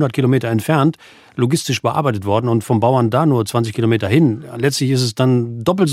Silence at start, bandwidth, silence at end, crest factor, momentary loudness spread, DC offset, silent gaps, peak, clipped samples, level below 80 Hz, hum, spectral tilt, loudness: 0 s; 15.5 kHz; 0 s; 14 dB; 4 LU; under 0.1%; none; -2 dBFS; under 0.1%; -58 dBFS; none; -6.5 dB/octave; -16 LUFS